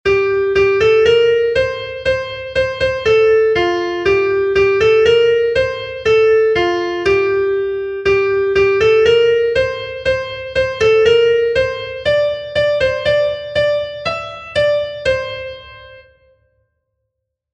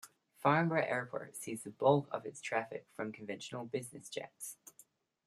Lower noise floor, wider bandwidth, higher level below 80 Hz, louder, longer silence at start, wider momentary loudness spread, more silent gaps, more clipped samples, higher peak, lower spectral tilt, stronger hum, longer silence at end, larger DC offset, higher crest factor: first, -75 dBFS vs -66 dBFS; second, 8.4 kHz vs 15 kHz; first, -40 dBFS vs -80 dBFS; first, -15 LUFS vs -37 LUFS; about the same, 0.05 s vs 0.05 s; second, 9 LU vs 15 LU; neither; neither; first, -2 dBFS vs -14 dBFS; about the same, -5 dB/octave vs -5.5 dB/octave; neither; first, 1.55 s vs 0.75 s; neither; second, 14 dB vs 24 dB